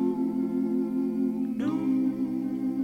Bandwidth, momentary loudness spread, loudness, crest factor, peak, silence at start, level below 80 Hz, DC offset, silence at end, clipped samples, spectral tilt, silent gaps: 5.6 kHz; 3 LU; -28 LUFS; 10 dB; -16 dBFS; 0 s; -66 dBFS; under 0.1%; 0 s; under 0.1%; -9 dB/octave; none